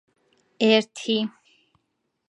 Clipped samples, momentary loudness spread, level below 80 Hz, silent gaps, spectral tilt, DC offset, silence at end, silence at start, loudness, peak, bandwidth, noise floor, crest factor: under 0.1%; 7 LU; -80 dBFS; none; -4.5 dB/octave; under 0.1%; 1 s; 0.6 s; -23 LUFS; -4 dBFS; 10.5 kHz; -76 dBFS; 22 dB